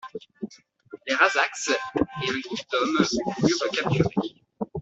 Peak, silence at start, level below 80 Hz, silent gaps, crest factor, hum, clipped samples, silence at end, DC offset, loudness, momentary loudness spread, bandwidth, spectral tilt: -4 dBFS; 0.05 s; -56 dBFS; none; 22 dB; none; under 0.1%; 0 s; under 0.1%; -24 LUFS; 18 LU; 8.2 kHz; -4.5 dB/octave